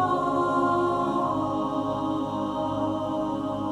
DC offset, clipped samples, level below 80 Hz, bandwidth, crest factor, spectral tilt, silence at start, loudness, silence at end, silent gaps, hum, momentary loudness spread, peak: under 0.1%; under 0.1%; -54 dBFS; 11 kHz; 14 dB; -7 dB/octave; 0 s; -26 LUFS; 0 s; none; none; 5 LU; -12 dBFS